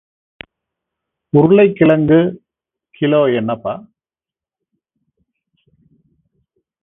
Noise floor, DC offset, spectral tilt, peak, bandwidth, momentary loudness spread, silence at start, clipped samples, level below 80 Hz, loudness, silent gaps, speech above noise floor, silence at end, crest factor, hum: under -90 dBFS; under 0.1%; -11 dB/octave; 0 dBFS; 3.9 kHz; 12 LU; 1.35 s; under 0.1%; -54 dBFS; -13 LUFS; none; over 78 dB; 3.05 s; 18 dB; none